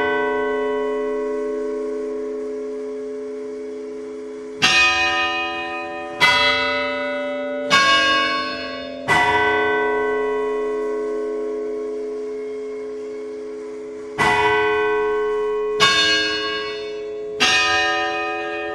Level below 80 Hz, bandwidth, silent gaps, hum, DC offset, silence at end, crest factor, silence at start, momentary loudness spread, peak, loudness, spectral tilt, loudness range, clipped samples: -50 dBFS; 13 kHz; none; none; under 0.1%; 0 s; 18 dB; 0 s; 16 LU; -2 dBFS; -19 LUFS; -2 dB/octave; 8 LU; under 0.1%